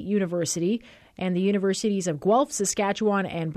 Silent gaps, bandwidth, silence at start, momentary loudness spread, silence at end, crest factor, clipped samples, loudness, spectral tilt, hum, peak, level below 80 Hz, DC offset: none; 14 kHz; 0 s; 5 LU; 0 s; 14 dB; under 0.1%; -25 LUFS; -5 dB/octave; none; -12 dBFS; -62 dBFS; under 0.1%